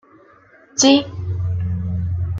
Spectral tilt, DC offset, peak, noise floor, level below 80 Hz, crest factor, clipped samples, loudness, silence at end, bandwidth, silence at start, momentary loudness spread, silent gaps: -4.5 dB/octave; under 0.1%; -2 dBFS; -49 dBFS; -42 dBFS; 18 dB; under 0.1%; -19 LUFS; 0 s; 7.8 kHz; 0.75 s; 12 LU; none